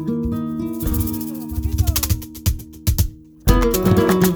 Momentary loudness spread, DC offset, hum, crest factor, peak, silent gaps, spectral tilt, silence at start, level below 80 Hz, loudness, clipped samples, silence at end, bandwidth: 9 LU; under 0.1%; none; 18 dB; -2 dBFS; none; -5.5 dB/octave; 0 s; -24 dBFS; -20 LUFS; under 0.1%; 0 s; over 20 kHz